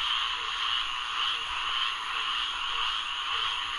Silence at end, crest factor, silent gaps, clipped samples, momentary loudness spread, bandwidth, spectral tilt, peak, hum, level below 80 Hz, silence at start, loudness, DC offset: 0 s; 14 dB; none; under 0.1%; 2 LU; 11.5 kHz; 1 dB/octave; -16 dBFS; none; -56 dBFS; 0 s; -28 LUFS; under 0.1%